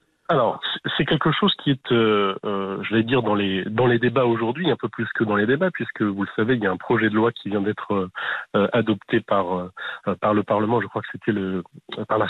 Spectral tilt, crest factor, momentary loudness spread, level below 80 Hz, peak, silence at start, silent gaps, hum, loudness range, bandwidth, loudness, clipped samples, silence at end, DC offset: -8.5 dB/octave; 14 dB; 7 LU; -60 dBFS; -8 dBFS; 0.3 s; none; none; 2 LU; 4.4 kHz; -22 LUFS; under 0.1%; 0 s; under 0.1%